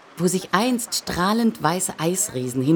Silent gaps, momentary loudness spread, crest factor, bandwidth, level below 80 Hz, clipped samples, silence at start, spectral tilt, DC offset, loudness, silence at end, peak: none; 3 LU; 20 dB; over 20 kHz; -52 dBFS; under 0.1%; 0.15 s; -4 dB/octave; under 0.1%; -22 LUFS; 0 s; -2 dBFS